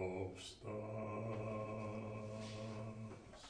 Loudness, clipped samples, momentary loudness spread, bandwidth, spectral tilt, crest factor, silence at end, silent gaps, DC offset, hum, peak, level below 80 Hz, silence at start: -47 LUFS; under 0.1%; 6 LU; 10 kHz; -6.5 dB/octave; 16 dB; 0 s; none; under 0.1%; none; -30 dBFS; -68 dBFS; 0 s